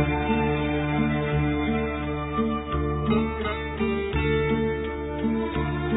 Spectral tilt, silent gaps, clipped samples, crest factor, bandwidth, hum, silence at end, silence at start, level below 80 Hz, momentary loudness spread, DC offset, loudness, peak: -11 dB/octave; none; under 0.1%; 16 dB; 4 kHz; none; 0 s; 0 s; -34 dBFS; 4 LU; under 0.1%; -26 LUFS; -10 dBFS